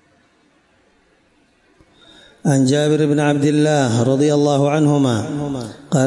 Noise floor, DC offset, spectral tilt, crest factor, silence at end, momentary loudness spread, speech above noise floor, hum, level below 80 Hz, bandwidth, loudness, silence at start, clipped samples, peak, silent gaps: -57 dBFS; under 0.1%; -6.5 dB/octave; 12 dB; 0 s; 9 LU; 42 dB; none; -58 dBFS; 11.5 kHz; -16 LUFS; 2.45 s; under 0.1%; -6 dBFS; none